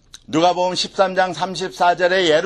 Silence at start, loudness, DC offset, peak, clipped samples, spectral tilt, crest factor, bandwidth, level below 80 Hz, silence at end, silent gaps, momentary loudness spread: 0.3 s; -18 LUFS; under 0.1%; 0 dBFS; under 0.1%; -3.5 dB/octave; 18 dB; 12 kHz; -54 dBFS; 0 s; none; 8 LU